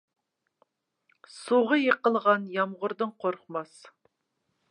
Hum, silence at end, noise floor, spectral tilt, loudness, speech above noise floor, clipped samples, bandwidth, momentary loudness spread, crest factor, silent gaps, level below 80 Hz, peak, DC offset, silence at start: none; 1.05 s; -79 dBFS; -5.5 dB/octave; -27 LUFS; 52 dB; under 0.1%; 11 kHz; 14 LU; 22 dB; none; -86 dBFS; -8 dBFS; under 0.1%; 1.35 s